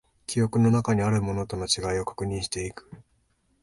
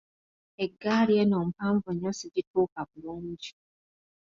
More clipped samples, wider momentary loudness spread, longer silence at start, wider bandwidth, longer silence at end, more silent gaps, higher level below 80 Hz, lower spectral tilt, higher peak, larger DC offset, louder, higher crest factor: neither; second, 10 LU vs 16 LU; second, 0.3 s vs 0.6 s; first, 11.5 kHz vs 7.6 kHz; second, 0.6 s vs 0.85 s; second, none vs 2.47-2.54 s, 2.72-2.76 s; first, -48 dBFS vs -66 dBFS; about the same, -5.5 dB/octave vs -6.5 dB/octave; first, -10 dBFS vs -14 dBFS; neither; first, -26 LUFS vs -29 LUFS; about the same, 18 dB vs 16 dB